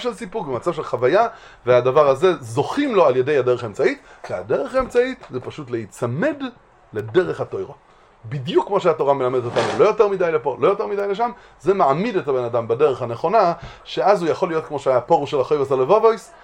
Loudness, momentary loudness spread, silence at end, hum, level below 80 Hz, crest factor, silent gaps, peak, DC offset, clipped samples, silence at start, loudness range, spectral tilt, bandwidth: -19 LUFS; 13 LU; 0.15 s; none; -52 dBFS; 18 dB; none; -2 dBFS; under 0.1%; under 0.1%; 0 s; 6 LU; -6.5 dB/octave; 11.5 kHz